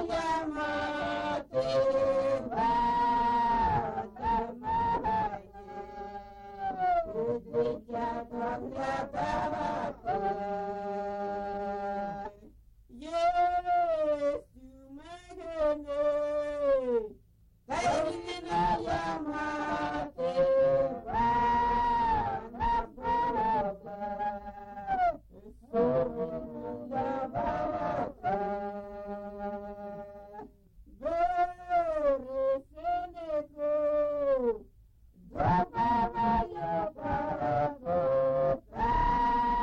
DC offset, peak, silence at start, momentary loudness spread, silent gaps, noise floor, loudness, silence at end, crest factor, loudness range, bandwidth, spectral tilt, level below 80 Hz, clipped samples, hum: under 0.1%; -16 dBFS; 0 s; 13 LU; none; -62 dBFS; -31 LUFS; 0 s; 14 dB; 6 LU; 10.5 kHz; -6.5 dB/octave; -48 dBFS; under 0.1%; none